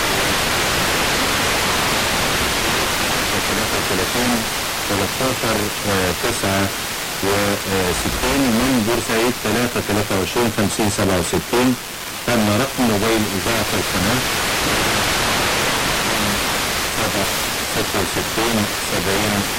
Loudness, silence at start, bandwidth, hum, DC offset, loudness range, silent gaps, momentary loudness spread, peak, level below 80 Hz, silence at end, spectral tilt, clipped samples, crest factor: -18 LUFS; 0 s; 17 kHz; none; under 0.1%; 2 LU; none; 3 LU; -6 dBFS; -36 dBFS; 0 s; -3 dB/octave; under 0.1%; 12 dB